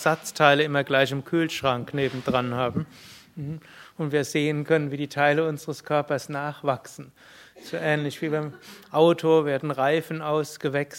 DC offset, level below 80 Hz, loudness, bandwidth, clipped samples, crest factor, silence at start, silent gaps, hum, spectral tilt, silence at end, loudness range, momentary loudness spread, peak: under 0.1%; -64 dBFS; -24 LUFS; 16.5 kHz; under 0.1%; 24 dB; 0 s; none; none; -5.5 dB/octave; 0 s; 4 LU; 15 LU; -2 dBFS